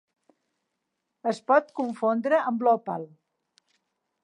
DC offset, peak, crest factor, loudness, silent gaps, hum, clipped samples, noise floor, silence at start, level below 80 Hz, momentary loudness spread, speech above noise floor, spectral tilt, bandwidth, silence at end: under 0.1%; -8 dBFS; 20 dB; -25 LUFS; none; none; under 0.1%; -81 dBFS; 1.25 s; -88 dBFS; 12 LU; 56 dB; -6.5 dB/octave; 10 kHz; 1.2 s